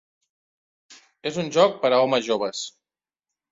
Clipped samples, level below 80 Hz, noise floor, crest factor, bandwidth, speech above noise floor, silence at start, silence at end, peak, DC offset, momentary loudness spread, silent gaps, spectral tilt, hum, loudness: under 0.1%; -70 dBFS; under -90 dBFS; 22 dB; 7.8 kHz; over 68 dB; 0.9 s; 0.85 s; -4 dBFS; under 0.1%; 14 LU; none; -4 dB/octave; none; -22 LUFS